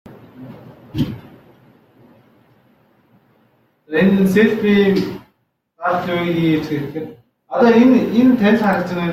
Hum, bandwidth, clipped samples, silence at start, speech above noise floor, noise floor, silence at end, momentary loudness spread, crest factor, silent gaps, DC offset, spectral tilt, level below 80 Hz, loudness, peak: none; 15.5 kHz; under 0.1%; 0.1 s; 50 dB; -65 dBFS; 0 s; 19 LU; 16 dB; none; under 0.1%; -7.5 dB/octave; -52 dBFS; -16 LUFS; -2 dBFS